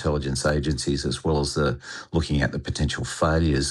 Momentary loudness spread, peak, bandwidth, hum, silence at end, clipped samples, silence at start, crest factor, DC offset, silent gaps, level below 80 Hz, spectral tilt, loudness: 5 LU; -8 dBFS; 12.5 kHz; none; 0 s; under 0.1%; 0 s; 16 dB; under 0.1%; none; -36 dBFS; -5 dB/octave; -25 LUFS